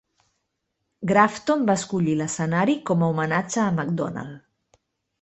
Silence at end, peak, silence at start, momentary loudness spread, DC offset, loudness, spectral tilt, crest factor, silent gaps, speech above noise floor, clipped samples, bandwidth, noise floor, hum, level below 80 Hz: 0.85 s; -2 dBFS; 1 s; 10 LU; under 0.1%; -23 LUFS; -6 dB/octave; 22 dB; none; 55 dB; under 0.1%; 8.4 kHz; -77 dBFS; none; -62 dBFS